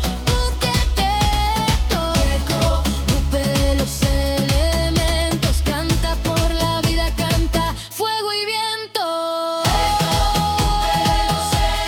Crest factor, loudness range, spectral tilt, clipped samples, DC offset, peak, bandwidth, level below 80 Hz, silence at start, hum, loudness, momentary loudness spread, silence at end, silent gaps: 14 dB; 1 LU; -4.5 dB/octave; under 0.1%; under 0.1%; -4 dBFS; 18 kHz; -22 dBFS; 0 s; none; -19 LUFS; 4 LU; 0 s; none